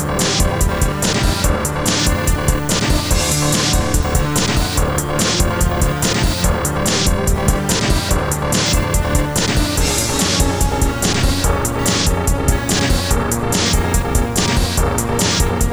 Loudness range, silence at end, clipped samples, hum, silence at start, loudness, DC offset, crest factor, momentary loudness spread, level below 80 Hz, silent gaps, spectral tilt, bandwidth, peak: 0 LU; 0 s; under 0.1%; none; 0 s; -16 LUFS; 1%; 14 dB; 2 LU; -20 dBFS; none; -4 dB/octave; over 20 kHz; -2 dBFS